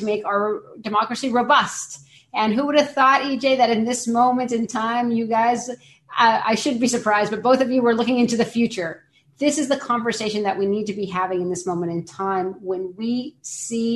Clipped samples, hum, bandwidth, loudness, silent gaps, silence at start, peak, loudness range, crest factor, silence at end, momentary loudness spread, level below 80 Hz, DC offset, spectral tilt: under 0.1%; none; 12.5 kHz; -21 LUFS; none; 0 s; -4 dBFS; 5 LU; 16 dB; 0 s; 11 LU; -64 dBFS; under 0.1%; -4 dB/octave